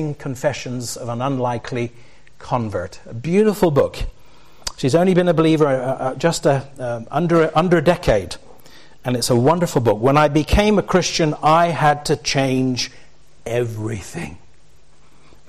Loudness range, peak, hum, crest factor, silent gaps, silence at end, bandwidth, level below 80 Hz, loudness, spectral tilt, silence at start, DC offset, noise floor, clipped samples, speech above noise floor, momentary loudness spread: 6 LU; -4 dBFS; none; 14 dB; none; 1.1 s; 14.5 kHz; -36 dBFS; -18 LUFS; -5.5 dB/octave; 0 s; 1%; -54 dBFS; under 0.1%; 36 dB; 14 LU